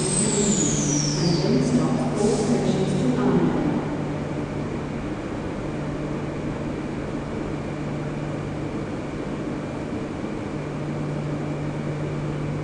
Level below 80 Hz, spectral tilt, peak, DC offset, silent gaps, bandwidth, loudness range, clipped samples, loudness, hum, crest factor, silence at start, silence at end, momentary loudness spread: -42 dBFS; -5 dB/octave; -10 dBFS; under 0.1%; none; 10 kHz; 8 LU; under 0.1%; -25 LUFS; none; 16 dB; 0 s; 0 s; 9 LU